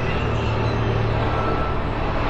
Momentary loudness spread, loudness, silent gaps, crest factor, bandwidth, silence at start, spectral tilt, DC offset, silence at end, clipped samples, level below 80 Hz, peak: 3 LU; -23 LUFS; none; 12 dB; 7.8 kHz; 0 s; -7.5 dB/octave; under 0.1%; 0 s; under 0.1%; -28 dBFS; -8 dBFS